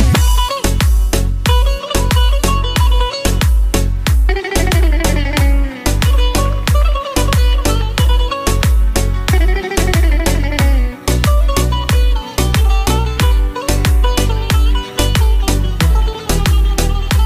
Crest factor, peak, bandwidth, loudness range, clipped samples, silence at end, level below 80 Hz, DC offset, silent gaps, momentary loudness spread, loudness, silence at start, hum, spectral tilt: 12 dB; 0 dBFS; 16 kHz; 0 LU; under 0.1%; 0 s; -14 dBFS; 0.2%; none; 3 LU; -15 LUFS; 0 s; none; -4.5 dB/octave